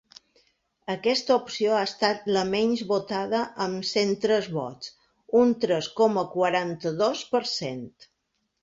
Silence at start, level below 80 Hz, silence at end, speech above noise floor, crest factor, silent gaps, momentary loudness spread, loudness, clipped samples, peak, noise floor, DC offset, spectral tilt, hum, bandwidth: 0.9 s; -66 dBFS; 0.75 s; 52 dB; 18 dB; none; 11 LU; -25 LUFS; under 0.1%; -8 dBFS; -77 dBFS; under 0.1%; -4.5 dB/octave; none; 7.8 kHz